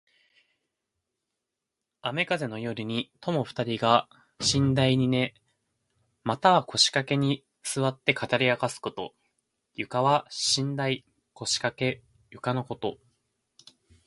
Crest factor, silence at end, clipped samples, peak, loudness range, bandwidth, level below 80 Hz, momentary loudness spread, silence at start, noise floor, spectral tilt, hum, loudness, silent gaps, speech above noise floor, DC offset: 24 dB; 1.15 s; under 0.1%; -4 dBFS; 7 LU; 11.5 kHz; -60 dBFS; 13 LU; 2.05 s; -86 dBFS; -4 dB/octave; none; -27 LUFS; none; 59 dB; under 0.1%